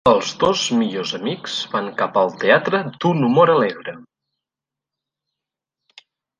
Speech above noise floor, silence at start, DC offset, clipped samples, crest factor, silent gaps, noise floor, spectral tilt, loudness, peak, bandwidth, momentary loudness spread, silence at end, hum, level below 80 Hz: 69 dB; 0.05 s; under 0.1%; under 0.1%; 18 dB; none; -87 dBFS; -5 dB/octave; -18 LUFS; -2 dBFS; 10 kHz; 10 LU; 2.35 s; none; -56 dBFS